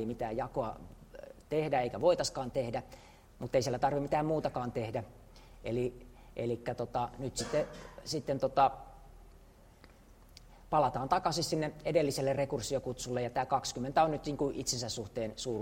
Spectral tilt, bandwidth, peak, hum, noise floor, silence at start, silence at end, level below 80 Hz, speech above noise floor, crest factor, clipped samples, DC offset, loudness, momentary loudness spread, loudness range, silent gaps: -5 dB/octave; 16 kHz; -14 dBFS; none; -58 dBFS; 0 s; 0 s; -56 dBFS; 25 dB; 20 dB; under 0.1%; under 0.1%; -34 LUFS; 12 LU; 4 LU; none